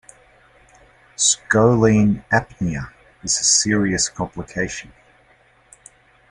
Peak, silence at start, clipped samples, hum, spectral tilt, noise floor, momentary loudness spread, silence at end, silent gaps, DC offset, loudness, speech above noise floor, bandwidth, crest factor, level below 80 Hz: -2 dBFS; 1.2 s; under 0.1%; none; -3.5 dB/octave; -55 dBFS; 16 LU; 1.45 s; none; under 0.1%; -18 LUFS; 37 dB; 11.5 kHz; 18 dB; -46 dBFS